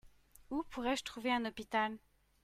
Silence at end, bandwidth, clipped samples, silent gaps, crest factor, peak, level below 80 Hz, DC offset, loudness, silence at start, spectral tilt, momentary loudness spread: 0.45 s; 16 kHz; under 0.1%; none; 18 dB; -22 dBFS; -64 dBFS; under 0.1%; -38 LUFS; 0.05 s; -3.5 dB/octave; 7 LU